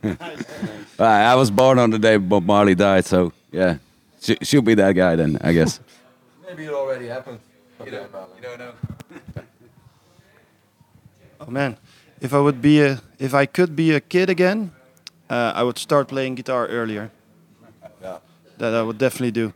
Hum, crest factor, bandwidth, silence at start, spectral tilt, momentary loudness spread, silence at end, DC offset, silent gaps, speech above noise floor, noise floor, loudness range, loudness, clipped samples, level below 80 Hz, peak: none; 18 dB; 17.5 kHz; 0.05 s; -6 dB/octave; 21 LU; 0.05 s; under 0.1%; none; 39 dB; -57 dBFS; 19 LU; -19 LUFS; under 0.1%; -56 dBFS; -2 dBFS